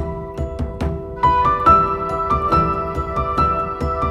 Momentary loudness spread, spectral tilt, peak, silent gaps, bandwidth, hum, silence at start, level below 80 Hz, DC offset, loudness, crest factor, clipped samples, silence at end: 13 LU; -8 dB/octave; -2 dBFS; none; 11 kHz; none; 0 s; -30 dBFS; under 0.1%; -18 LUFS; 16 dB; under 0.1%; 0 s